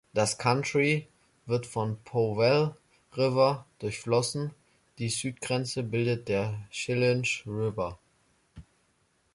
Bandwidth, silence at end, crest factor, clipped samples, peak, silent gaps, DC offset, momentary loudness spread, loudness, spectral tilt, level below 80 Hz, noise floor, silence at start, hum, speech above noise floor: 11.5 kHz; 0.7 s; 18 dB; under 0.1%; -10 dBFS; none; under 0.1%; 11 LU; -29 LUFS; -5 dB/octave; -60 dBFS; -70 dBFS; 0.15 s; none; 42 dB